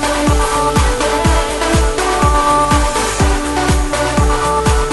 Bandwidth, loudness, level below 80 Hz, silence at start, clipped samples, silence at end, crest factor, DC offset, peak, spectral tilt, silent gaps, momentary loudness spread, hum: 12 kHz; -14 LUFS; -18 dBFS; 0 s; under 0.1%; 0 s; 10 dB; under 0.1%; -2 dBFS; -4.5 dB/octave; none; 3 LU; none